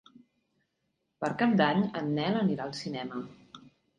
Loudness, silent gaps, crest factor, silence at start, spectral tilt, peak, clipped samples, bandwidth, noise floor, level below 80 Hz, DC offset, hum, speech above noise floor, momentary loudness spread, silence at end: -30 LUFS; none; 20 dB; 1.2 s; -6.5 dB/octave; -12 dBFS; under 0.1%; 9.8 kHz; -80 dBFS; -70 dBFS; under 0.1%; none; 51 dB; 13 LU; 0.3 s